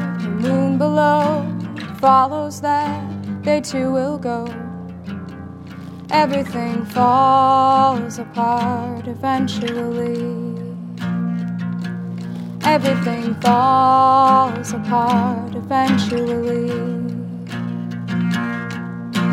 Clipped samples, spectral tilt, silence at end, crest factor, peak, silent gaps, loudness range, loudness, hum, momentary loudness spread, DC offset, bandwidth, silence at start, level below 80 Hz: under 0.1%; -6.5 dB/octave; 0 s; 16 dB; -2 dBFS; none; 7 LU; -18 LUFS; none; 15 LU; under 0.1%; 15 kHz; 0 s; -58 dBFS